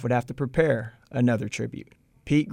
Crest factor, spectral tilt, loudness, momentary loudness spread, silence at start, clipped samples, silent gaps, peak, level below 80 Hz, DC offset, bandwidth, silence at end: 18 dB; -7 dB/octave; -26 LUFS; 10 LU; 0 s; under 0.1%; none; -8 dBFS; -52 dBFS; under 0.1%; 11 kHz; 0 s